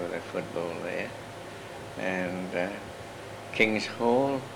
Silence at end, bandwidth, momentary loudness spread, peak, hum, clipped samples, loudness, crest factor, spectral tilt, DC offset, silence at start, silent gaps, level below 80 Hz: 0 s; 18 kHz; 16 LU; -8 dBFS; none; under 0.1%; -30 LUFS; 24 dB; -5 dB/octave; under 0.1%; 0 s; none; -62 dBFS